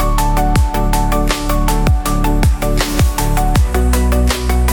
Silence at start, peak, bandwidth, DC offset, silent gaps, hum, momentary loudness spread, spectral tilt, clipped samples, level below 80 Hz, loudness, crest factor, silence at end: 0 s; 0 dBFS; 19.5 kHz; under 0.1%; none; none; 2 LU; -5 dB/octave; under 0.1%; -14 dBFS; -15 LUFS; 12 dB; 0 s